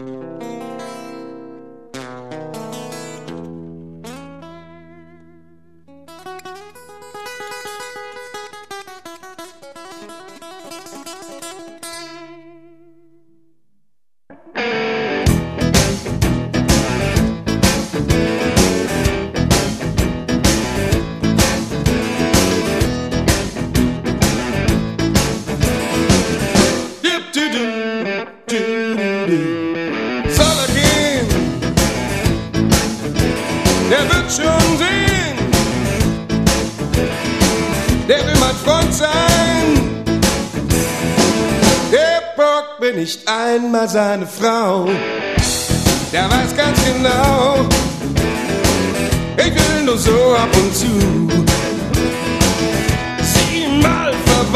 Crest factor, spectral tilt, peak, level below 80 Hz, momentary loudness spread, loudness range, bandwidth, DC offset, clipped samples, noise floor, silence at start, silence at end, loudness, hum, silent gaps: 16 dB; -4.5 dB/octave; 0 dBFS; -28 dBFS; 19 LU; 19 LU; 14 kHz; 0.2%; under 0.1%; -73 dBFS; 0 s; 0 s; -16 LUFS; none; none